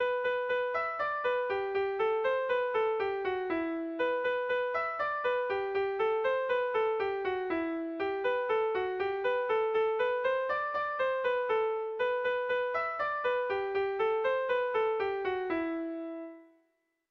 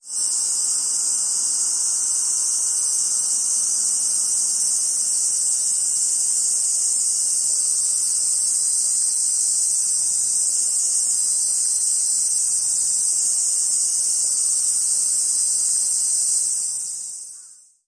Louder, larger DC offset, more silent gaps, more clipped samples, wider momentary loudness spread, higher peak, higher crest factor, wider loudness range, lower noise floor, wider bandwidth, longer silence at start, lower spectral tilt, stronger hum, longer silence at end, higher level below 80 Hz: second, -31 LUFS vs -17 LUFS; neither; neither; neither; first, 4 LU vs 1 LU; second, -20 dBFS vs -8 dBFS; about the same, 12 dB vs 14 dB; about the same, 1 LU vs 1 LU; first, -76 dBFS vs -46 dBFS; second, 6 kHz vs 10.5 kHz; about the same, 0 s vs 0.05 s; first, -5.5 dB/octave vs 3.5 dB/octave; neither; first, 0.65 s vs 0.35 s; first, -68 dBFS vs -78 dBFS